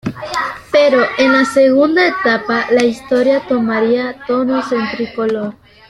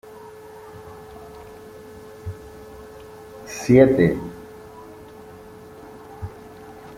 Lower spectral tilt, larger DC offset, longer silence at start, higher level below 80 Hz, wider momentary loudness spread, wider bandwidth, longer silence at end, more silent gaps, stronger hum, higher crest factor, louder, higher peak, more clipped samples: second, -5 dB/octave vs -7.5 dB/octave; neither; second, 0.05 s vs 0.75 s; about the same, -52 dBFS vs -50 dBFS; second, 9 LU vs 26 LU; second, 12.5 kHz vs 16 kHz; about the same, 0.35 s vs 0.25 s; neither; neither; second, 14 dB vs 24 dB; first, -14 LUFS vs -18 LUFS; about the same, 0 dBFS vs -2 dBFS; neither